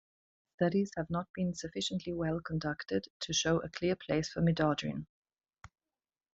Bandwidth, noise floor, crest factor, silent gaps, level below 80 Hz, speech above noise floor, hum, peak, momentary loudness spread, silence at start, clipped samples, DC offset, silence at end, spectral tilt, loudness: 8 kHz; under -90 dBFS; 20 dB; 1.29-1.34 s, 3.10-3.20 s, 5.09-5.23 s; -60 dBFS; over 56 dB; none; -16 dBFS; 7 LU; 0.6 s; under 0.1%; under 0.1%; 0.65 s; -5 dB/octave; -34 LUFS